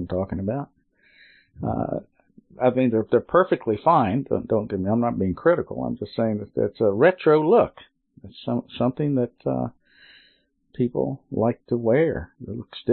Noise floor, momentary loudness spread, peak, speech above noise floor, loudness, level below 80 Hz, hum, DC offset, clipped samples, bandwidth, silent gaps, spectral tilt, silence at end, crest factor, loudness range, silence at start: -63 dBFS; 12 LU; -6 dBFS; 41 dB; -23 LUFS; -52 dBFS; none; under 0.1%; under 0.1%; 4.4 kHz; none; -12 dB/octave; 0 s; 18 dB; 5 LU; 0 s